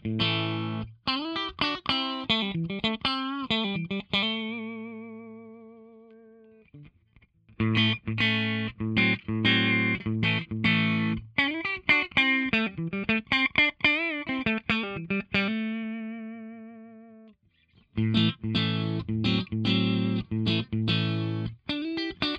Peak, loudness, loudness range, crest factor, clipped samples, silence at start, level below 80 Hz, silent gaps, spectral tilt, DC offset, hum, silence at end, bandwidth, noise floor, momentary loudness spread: -6 dBFS; -26 LUFS; 8 LU; 22 dB; under 0.1%; 0.05 s; -54 dBFS; none; -6.5 dB/octave; under 0.1%; none; 0 s; 8 kHz; -63 dBFS; 12 LU